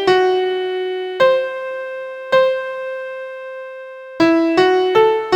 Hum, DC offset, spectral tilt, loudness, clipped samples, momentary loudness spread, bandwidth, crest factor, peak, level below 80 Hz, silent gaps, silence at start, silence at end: none; under 0.1%; -5 dB/octave; -17 LUFS; under 0.1%; 16 LU; 9.2 kHz; 16 dB; -2 dBFS; -60 dBFS; none; 0 s; 0 s